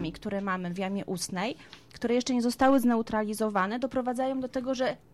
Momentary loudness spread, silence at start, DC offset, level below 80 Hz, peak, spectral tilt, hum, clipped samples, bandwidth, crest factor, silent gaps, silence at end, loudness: 10 LU; 0 s; under 0.1%; -58 dBFS; -12 dBFS; -5 dB/octave; none; under 0.1%; 14.5 kHz; 16 dB; none; 0.15 s; -29 LUFS